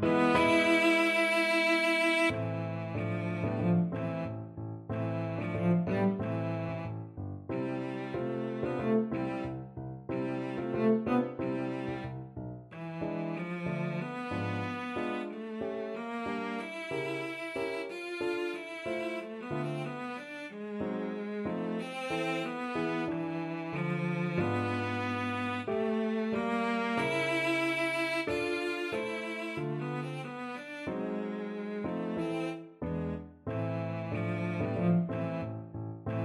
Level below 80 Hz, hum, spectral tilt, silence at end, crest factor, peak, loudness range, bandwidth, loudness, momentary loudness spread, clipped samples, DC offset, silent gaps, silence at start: -62 dBFS; none; -6.5 dB/octave; 0 s; 20 dB; -14 dBFS; 6 LU; 14 kHz; -33 LUFS; 13 LU; under 0.1%; under 0.1%; none; 0 s